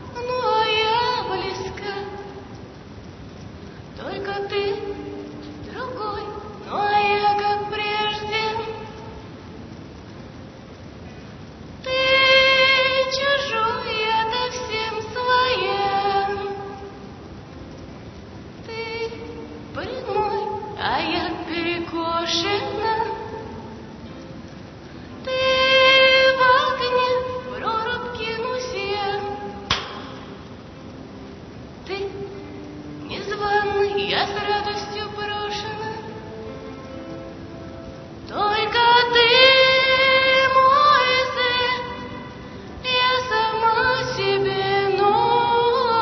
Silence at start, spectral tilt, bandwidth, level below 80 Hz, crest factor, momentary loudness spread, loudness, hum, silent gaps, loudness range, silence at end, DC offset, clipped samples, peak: 0 s; -3.5 dB/octave; 6.4 kHz; -48 dBFS; 20 dB; 24 LU; -20 LUFS; none; none; 14 LU; 0 s; under 0.1%; under 0.1%; -2 dBFS